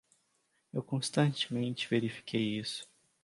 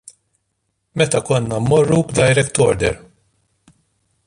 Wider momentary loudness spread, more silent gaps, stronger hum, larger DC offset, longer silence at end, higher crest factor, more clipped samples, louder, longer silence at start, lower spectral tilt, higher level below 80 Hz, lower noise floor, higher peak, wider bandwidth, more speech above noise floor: first, 11 LU vs 7 LU; neither; neither; neither; second, 0.4 s vs 1.3 s; about the same, 20 dB vs 16 dB; neither; second, -34 LUFS vs -16 LUFS; second, 0.75 s vs 0.95 s; about the same, -5 dB/octave vs -5 dB/octave; second, -74 dBFS vs -42 dBFS; first, -76 dBFS vs -71 dBFS; second, -16 dBFS vs -2 dBFS; about the same, 11.5 kHz vs 11.5 kHz; second, 43 dB vs 56 dB